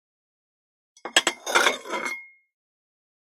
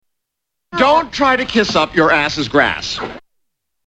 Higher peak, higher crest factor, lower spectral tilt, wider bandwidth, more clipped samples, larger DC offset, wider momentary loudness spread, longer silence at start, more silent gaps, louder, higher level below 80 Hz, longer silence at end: about the same, -2 dBFS vs 0 dBFS; first, 28 dB vs 16 dB; second, 0.5 dB/octave vs -4 dB/octave; first, 16.5 kHz vs 9.4 kHz; neither; neither; first, 14 LU vs 11 LU; first, 1.05 s vs 0.7 s; neither; second, -23 LUFS vs -14 LUFS; second, -78 dBFS vs -44 dBFS; first, 0.95 s vs 0.65 s